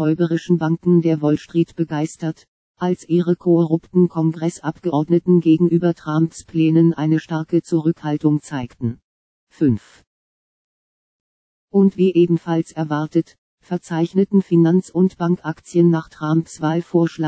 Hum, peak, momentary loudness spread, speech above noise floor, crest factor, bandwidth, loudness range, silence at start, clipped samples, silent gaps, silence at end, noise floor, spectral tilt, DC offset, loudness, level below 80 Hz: none; -4 dBFS; 9 LU; over 72 dB; 16 dB; 8 kHz; 5 LU; 0 s; under 0.1%; 2.48-2.74 s, 9.04-9.47 s, 10.07-11.68 s, 13.38-13.58 s; 0 s; under -90 dBFS; -8.5 dB/octave; under 0.1%; -19 LUFS; -58 dBFS